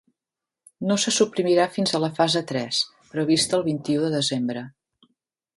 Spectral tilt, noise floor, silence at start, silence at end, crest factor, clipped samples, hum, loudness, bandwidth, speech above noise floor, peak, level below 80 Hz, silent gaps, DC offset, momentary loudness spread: -4 dB/octave; -88 dBFS; 0.8 s; 0.85 s; 18 dB; under 0.1%; none; -23 LUFS; 11.5 kHz; 66 dB; -6 dBFS; -66 dBFS; none; under 0.1%; 8 LU